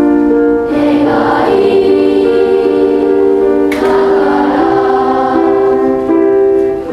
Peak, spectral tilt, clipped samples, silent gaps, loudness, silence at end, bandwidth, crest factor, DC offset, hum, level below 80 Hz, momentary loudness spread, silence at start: 0 dBFS; -7 dB/octave; under 0.1%; none; -10 LUFS; 0 s; 6.6 kHz; 10 dB; under 0.1%; none; -40 dBFS; 2 LU; 0 s